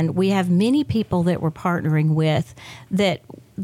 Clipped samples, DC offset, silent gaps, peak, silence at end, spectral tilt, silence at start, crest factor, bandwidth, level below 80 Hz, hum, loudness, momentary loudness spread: under 0.1%; under 0.1%; none; -8 dBFS; 0 s; -7.5 dB/octave; 0 s; 12 dB; 13 kHz; -54 dBFS; none; -20 LUFS; 12 LU